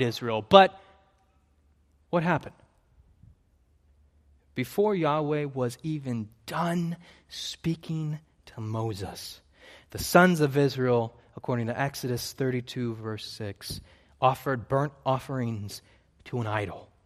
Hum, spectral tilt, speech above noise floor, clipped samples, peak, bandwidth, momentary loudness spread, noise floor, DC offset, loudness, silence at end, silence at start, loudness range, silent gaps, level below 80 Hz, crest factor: none; -5.5 dB/octave; 38 dB; under 0.1%; 0 dBFS; 15 kHz; 18 LU; -65 dBFS; under 0.1%; -28 LUFS; 0.2 s; 0 s; 9 LU; none; -60 dBFS; 28 dB